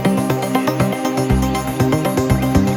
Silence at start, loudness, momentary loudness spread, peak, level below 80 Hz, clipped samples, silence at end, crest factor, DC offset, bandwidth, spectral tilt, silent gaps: 0 s; -17 LUFS; 2 LU; 0 dBFS; -30 dBFS; under 0.1%; 0 s; 16 dB; under 0.1%; 19.5 kHz; -6.5 dB/octave; none